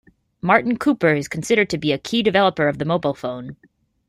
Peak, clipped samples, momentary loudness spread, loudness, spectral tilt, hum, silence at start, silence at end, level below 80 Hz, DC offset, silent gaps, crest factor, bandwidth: -2 dBFS; under 0.1%; 11 LU; -19 LUFS; -5.5 dB/octave; none; 0.45 s; 0.55 s; -56 dBFS; under 0.1%; none; 18 dB; 15.5 kHz